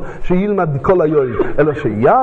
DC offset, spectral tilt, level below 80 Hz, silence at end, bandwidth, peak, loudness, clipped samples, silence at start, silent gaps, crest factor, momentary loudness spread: under 0.1%; -9.5 dB/octave; -32 dBFS; 0 s; 7.4 kHz; 0 dBFS; -15 LUFS; under 0.1%; 0 s; none; 14 dB; 5 LU